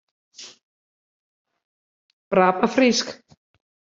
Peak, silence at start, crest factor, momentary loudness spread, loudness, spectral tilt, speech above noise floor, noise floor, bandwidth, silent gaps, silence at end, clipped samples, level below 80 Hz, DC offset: -2 dBFS; 0.4 s; 22 dB; 23 LU; -19 LUFS; -4 dB/octave; over 71 dB; under -90 dBFS; 7.6 kHz; 0.63-1.45 s, 1.65-2.31 s; 0.8 s; under 0.1%; -66 dBFS; under 0.1%